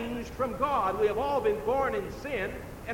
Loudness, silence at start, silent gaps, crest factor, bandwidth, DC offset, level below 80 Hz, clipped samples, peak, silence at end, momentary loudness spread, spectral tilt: -30 LUFS; 0 s; none; 14 dB; 17 kHz; under 0.1%; -48 dBFS; under 0.1%; -16 dBFS; 0 s; 8 LU; -6 dB/octave